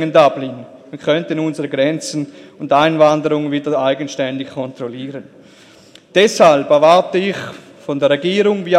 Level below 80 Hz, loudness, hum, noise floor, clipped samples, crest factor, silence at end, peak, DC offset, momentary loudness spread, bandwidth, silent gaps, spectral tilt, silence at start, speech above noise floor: -64 dBFS; -15 LUFS; none; -44 dBFS; under 0.1%; 16 dB; 0 s; 0 dBFS; under 0.1%; 19 LU; 12.5 kHz; none; -5 dB/octave; 0 s; 30 dB